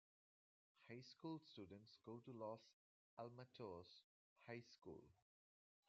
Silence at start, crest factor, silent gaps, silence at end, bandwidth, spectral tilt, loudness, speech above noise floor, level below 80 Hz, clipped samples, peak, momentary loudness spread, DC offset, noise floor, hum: 0.75 s; 20 dB; 2.73-3.17 s, 4.04-4.36 s; 0.75 s; 7.2 kHz; -5 dB/octave; -59 LUFS; over 32 dB; under -90 dBFS; under 0.1%; -40 dBFS; 8 LU; under 0.1%; under -90 dBFS; none